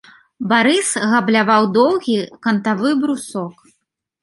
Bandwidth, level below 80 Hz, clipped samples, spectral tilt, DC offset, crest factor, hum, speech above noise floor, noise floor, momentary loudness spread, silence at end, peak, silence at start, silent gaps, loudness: 11.5 kHz; -66 dBFS; under 0.1%; -4 dB/octave; under 0.1%; 16 dB; none; 54 dB; -70 dBFS; 12 LU; 0.7 s; -2 dBFS; 0.4 s; none; -16 LUFS